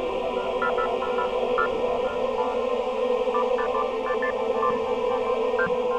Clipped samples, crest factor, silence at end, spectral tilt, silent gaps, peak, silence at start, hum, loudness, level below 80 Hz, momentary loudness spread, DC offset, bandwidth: under 0.1%; 14 dB; 0 s; -5 dB/octave; none; -12 dBFS; 0 s; none; -25 LUFS; -50 dBFS; 2 LU; under 0.1%; 8.8 kHz